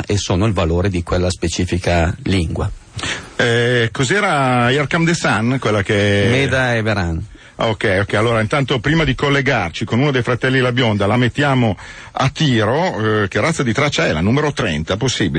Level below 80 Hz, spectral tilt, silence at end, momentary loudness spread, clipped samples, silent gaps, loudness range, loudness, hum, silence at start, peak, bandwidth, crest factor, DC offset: -36 dBFS; -5.5 dB/octave; 0 s; 5 LU; under 0.1%; none; 2 LU; -16 LUFS; none; 0 s; -4 dBFS; 10 kHz; 12 dB; under 0.1%